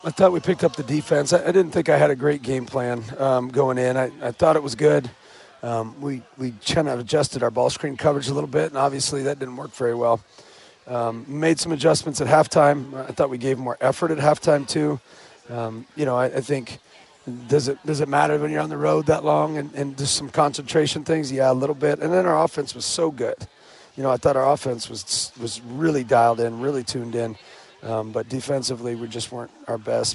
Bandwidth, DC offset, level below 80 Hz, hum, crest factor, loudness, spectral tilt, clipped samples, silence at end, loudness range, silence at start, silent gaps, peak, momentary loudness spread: 11.5 kHz; under 0.1%; -56 dBFS; none; 20 dB; -22 LUFS; -5 dB/octave; under 0.1%; 0 s; 4 LU; 0.05 s; none; -2 dBFS; 12 LU